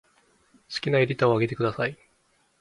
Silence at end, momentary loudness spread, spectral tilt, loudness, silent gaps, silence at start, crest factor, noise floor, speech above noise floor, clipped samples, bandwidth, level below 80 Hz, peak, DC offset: 0.65 s; 9 LU; -7 dB/octave; -25 LUFS; none; 0.7 s; 20 dB; -67 dBFS; 42 dB; under 0.1%; 11.5 kHz; -62 dBFS; -6 dBFS; under 0.1%